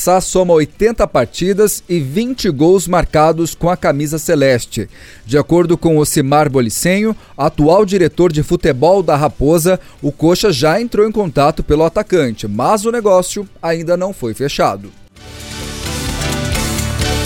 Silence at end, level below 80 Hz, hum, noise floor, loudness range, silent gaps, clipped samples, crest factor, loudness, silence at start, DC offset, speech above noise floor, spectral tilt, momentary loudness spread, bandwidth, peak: 0 s; -30 dBFS; none; -32 dBFS; 5 LU; none; under 0.1%; 12 dB; -14 LUFS; 0 s; under 0.1%; 20 dB; -5 dB/octave; 8 LU; 18 kHz; 0 dBFS